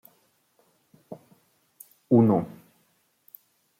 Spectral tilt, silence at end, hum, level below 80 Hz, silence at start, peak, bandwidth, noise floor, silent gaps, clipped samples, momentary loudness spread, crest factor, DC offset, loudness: -10.5 dB/octave; 1.3 s; none; -72 dBFS; 1.1 s; -8 dBFS; 16 kHz; -68 dBFS; none; under 0.1%; 27 LU; 22 dB; under 0.1%; -22 LUFS